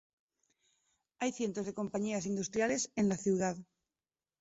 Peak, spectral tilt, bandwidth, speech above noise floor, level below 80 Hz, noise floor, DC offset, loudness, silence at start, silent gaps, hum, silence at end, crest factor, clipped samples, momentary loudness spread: -20 dBFS; -5.5 dB/octave; 8 kHz; over 56 dB; -70 dBFS; under -90 dBFS; under 0.1%; -35 LUFS; 1.2 s; none; none; 0.8 s; 16 dB; under 0.1%; 6 LU